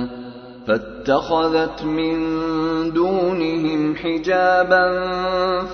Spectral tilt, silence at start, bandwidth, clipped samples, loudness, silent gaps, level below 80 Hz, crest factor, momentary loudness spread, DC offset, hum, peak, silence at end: -6.5 dB/octave; 0 s; 6.6 kHz; under 0.1%; -19 LUFS; none; -46 dBFS; 18 dB; 7 LU; under 0.1%; none; -2 dBFS; 0 s